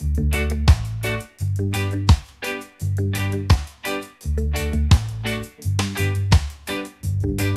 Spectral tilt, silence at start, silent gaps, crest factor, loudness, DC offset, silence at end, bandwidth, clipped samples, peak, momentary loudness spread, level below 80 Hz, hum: -5.5 dB/octave; 0 s; none; 20 dB; -22 LUFS; under 0.1%; 0 s; 14.5 kHz; under 0.1%; 0 dBFS; 10 LU; -26 dBFS; none